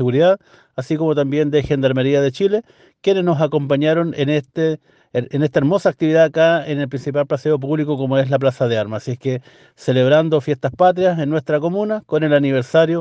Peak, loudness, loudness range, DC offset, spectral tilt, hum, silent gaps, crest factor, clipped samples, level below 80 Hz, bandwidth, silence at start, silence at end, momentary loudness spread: -2 dBFS; -17 LUFS; 2 LU; under 0.1%; -7.5 dB/octave; none; none; 14 dB; under 0.1%; -54 dBFS; 8.4 kHz; 0 s; 0 s; 9 LU